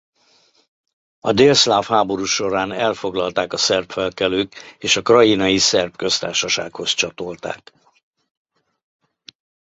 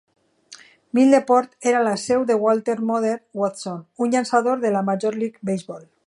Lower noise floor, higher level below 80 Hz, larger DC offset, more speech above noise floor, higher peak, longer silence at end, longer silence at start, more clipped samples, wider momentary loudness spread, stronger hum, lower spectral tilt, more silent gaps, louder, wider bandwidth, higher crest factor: first, -58 dBFS vs -48 dBFS; first, -54 dBFS vs -70 dBFS; neither; first, 39 dB vs 27 dB; first, 0 dBFS vs -4 dBFS; first, 2.15 s vs 0.25 s; first, 1.25 s vs 0.5 s; neither; first, 14 LU vs 11 LU; neither; second, -3 dB/octave vs -5.5 dB/octave; neither; first, -17 LUFS vs -21 LUFS; second, 8.2 kHz vs 11.5 kHz; about the same, 20 dB vs 18 dB